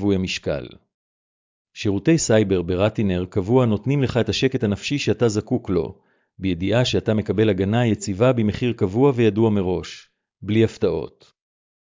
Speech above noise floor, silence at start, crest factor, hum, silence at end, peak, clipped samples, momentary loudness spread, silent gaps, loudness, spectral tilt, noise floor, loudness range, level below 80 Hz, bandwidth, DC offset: over 70 dB; 0 s; 16 dB; none; 0.75 s; -6 dBFS; under 0.1%; 10 LU; 0.94-1.65 s; -21 LUFS; -6 dB/octave; under -90 dBFS; 2 LU; -42 dBFS; 7.6 kHz; under 0.1%